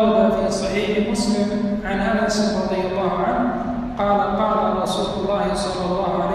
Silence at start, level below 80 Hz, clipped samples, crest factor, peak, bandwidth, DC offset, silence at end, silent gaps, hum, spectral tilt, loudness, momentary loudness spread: 0 s; -40 dBFS; under 0.1%; 14 dB; -6 dBFS; 13 kHz; under 0.1%; 0 s; none; none; -5.5 dB/octave; -21 LUFS; 4 LU